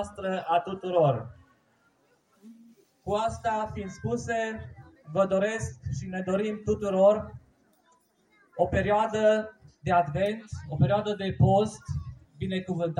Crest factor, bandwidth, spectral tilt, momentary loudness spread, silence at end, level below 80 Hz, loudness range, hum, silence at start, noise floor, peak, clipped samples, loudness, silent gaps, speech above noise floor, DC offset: 18 dB; 10.5 kHz; -6.5 dB/octave; 14 LU; 0 s; -54 dBFS; 7 LU; none; 0 s; -67 dBFS; -10 dBFS; under 0.1%; -28 LUFS; none; 40 dB; under 0.1%